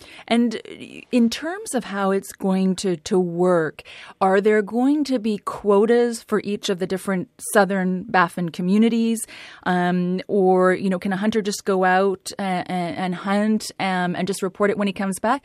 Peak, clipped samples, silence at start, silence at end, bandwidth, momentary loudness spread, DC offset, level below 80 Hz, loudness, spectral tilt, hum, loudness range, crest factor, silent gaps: -2 dBFS; under 0.1%; 0.1 s; 0.05 s; 15 kHz; 8 LU; under 0.1%; -62 dBFS; -21 LUFS; -5.5 dB/octave; none; 2 LU; 18 dB; none